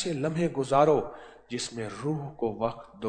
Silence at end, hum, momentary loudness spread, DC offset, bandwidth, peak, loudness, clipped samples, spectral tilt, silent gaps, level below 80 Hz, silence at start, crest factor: 0 s; none; 13 LU; under 0.1%; 9.4 kHz; -10 dBFS; -29 LUFS; under 0.1%; -6 dB/octave; none; -58 dBFS; 0 s; 20 dB